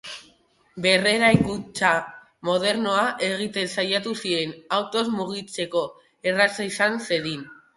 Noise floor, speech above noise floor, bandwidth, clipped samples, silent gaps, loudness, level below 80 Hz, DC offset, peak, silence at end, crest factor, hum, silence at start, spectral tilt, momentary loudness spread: -60 dBFS; 36 dB; 11.5 kHz; under 0.1%; none; -23 LUFS; -56 dBFS; under 0.1%; -2 dBFS; 0.2 s; 22 dB; none; 0.05 s; -4 dB/octave; 12 LU